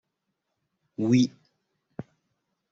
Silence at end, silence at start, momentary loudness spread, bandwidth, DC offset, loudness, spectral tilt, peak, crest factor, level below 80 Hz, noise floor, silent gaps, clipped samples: 0.7 s; 1 s; 21 LU; 7.8 kHz; under 0.1%; -25 LUFS; -7 dB/octave; -10 dBFS; 20 dB; -70 dBFS; -81 dBFS; none; under 0.1%